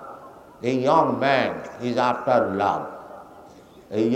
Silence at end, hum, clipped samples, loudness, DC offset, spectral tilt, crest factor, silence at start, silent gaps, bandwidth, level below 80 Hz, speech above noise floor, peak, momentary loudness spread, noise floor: 0 s; none; under 0.1%; -22 LUFS; under 0.1%; -6.5 dB/octave; 20 dB; 0 s; none; 15 kHz; -64 dBFS; 26 dB; -4 dBFS; 21 LU; -47 dBFS